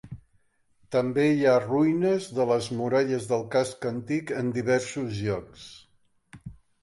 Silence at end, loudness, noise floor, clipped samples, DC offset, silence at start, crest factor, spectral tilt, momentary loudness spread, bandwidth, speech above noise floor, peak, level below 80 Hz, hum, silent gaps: 0.3 s; -26 LUFS; -66 dBFS; under 0.1%; under 0.1%; 0.05 s; 16 dB; -6 dB/octave; 23 LU; 11.5 kHz; 41 dB; -10 dBFS; -60 dBFS; none; none